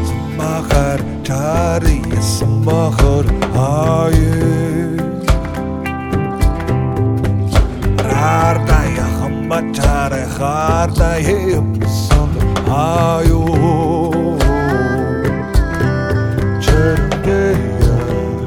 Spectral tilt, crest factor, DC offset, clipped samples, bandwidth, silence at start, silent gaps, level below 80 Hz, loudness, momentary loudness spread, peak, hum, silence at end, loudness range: -6.5 dB/octave; 14 dB; under 0.1%; under 0.1%; 17 kHz; 0 s; none; -20 dBFS; -15 LUFS; 5 LU; 0 dBFS; none; 0 s; 2 LU